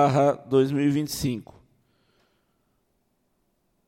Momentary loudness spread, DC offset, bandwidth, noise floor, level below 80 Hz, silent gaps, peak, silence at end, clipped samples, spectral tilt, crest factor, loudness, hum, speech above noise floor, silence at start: 9 LU; under 0.1%; 16.5 kHz; -72 dBFS; -58 dBFS; none; -8 dBFS; 2.45 s; under 0.1%; -6.5 dB/octave; 18 dB; -24 LUFS; none; 49 dB; 0 s